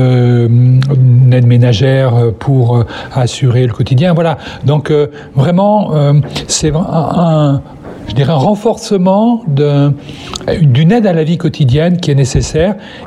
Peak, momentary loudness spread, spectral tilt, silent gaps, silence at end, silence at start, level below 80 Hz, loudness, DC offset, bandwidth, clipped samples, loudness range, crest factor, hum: 0 dBFS; 7 LU; -7 dB/octave; none; 0 s; 0 s; -34 dBFS; -10 LUFS; under 0.1%; 10.5 kHz; under 0.1%; 3 LU; 8 dB; none